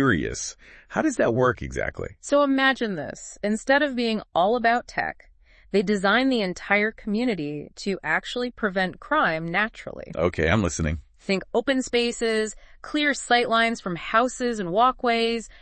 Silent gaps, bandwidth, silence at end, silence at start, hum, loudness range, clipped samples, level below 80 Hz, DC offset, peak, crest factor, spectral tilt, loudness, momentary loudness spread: none; 8.8 kHz; 0.15 s; 0 s; none; 2 LU; under 0.1%; -48 dBFS; under 0.1%; -4 dBFS; 20 dB; -4.5 dB/octave; -24 LUFS; 10 LU